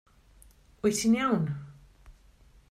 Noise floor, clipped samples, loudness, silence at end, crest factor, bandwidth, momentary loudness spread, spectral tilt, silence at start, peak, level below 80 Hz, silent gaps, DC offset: -58 dBFS; under 0.1%; -28 LUFS; 0.6 s; 18 dB; 15.5 kHz; 15 LU; -5 dB/octave; 0.85 s; -14 dBFS; -58 dBFS; none; under 0.1%